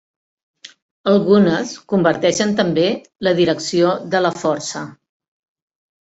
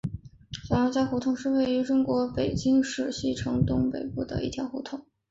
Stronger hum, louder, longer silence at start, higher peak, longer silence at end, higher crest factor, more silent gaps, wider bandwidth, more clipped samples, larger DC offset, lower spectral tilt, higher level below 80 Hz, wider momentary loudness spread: neither; first, -17 LUFS vs -27 LUFS; first, 0.65 s vs 0.05 s; first, -2 dBFS vs -10 dBFS; first, 1.1 s vs 0.3 s; about the same, 16 dB vs 16 dB; first, 0.82-1.04 s vs none; about the same, 8 kHz vs 8 kHz; neither; neither; second, -5 dB/octave vs -6.5 dB/octave; second, -58 dBFS vs -46 dBFS; second, 10 LU vs 13 LU